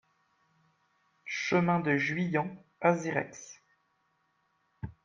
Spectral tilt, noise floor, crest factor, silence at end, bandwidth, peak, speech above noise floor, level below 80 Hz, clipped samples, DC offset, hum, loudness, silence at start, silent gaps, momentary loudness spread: -6 dB/octave; -75 dBFS; 24 dB; 0.15 s; 7.4 kHz; -10 dBFS; 45 dB; -66 dBFS; under 0.1%; under 0.1%; none; -30 LUFS; 1.25 s; none; 19 LU